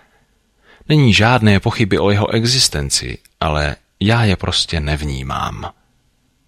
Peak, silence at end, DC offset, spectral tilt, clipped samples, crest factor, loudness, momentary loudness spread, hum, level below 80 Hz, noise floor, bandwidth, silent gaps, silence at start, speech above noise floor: -2 dBFS; 0.8 s; under 0.1%; -4.5 dB/octave; under 0.1%; 16 dB; -15 LUFS; 11 LU; none; -32 dBFS; -60 dBFS; 15 kHz; none; 0.9 s; 45 dB